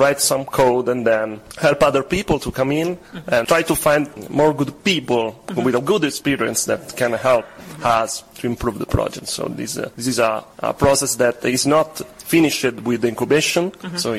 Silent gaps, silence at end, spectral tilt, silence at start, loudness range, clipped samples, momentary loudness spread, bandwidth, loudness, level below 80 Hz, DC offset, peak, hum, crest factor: none; 0 s; -4 dB/octave; 0 s; 3 LU; under 0.1%; 9 LU; 16 kHz; -19 LUFS; -44 dBFS; under 0.1%; -4 dBFS; none; 16 dB